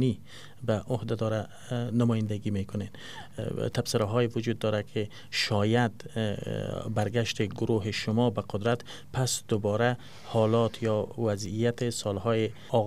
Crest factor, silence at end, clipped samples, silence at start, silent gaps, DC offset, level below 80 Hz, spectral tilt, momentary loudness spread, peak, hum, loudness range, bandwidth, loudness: 18 dB; 0 s; under 0.1%; 0 s; none; 0.5%; -60 dBFS; -5.5 dB/octave; 9 LU; -10 dBFS; none; 3 LU; 15 kHz; -29 LUFS